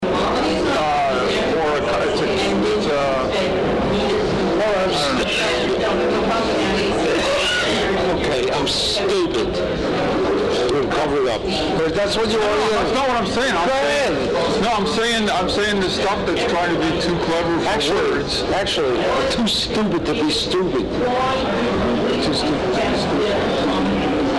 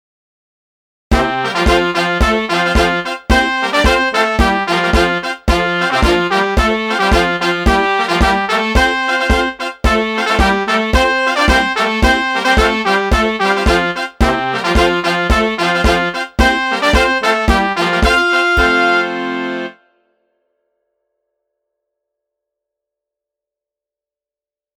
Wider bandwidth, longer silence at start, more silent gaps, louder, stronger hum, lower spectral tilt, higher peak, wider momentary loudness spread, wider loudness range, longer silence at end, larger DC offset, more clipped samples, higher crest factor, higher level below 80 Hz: second, 11.5 kHz vs 16.5 kHz; second, 0 s vs 1.1 s; neither; second, -19 LUFS vs -13 LUFS; neither; about the same, -4.5 dB/octave vs -4.5 dB/octave; second, -14 dBFS vs 0 dBFS; about the same, 2 LU vs 4 LU; about the same, 1 LU vs 3 LU; second, 0 s vs 5.1 s; first, 0.1% vs under 0.1%; neither; second, 4 dB vs 14 dB; second, -38 dBFS vs -22 dBFS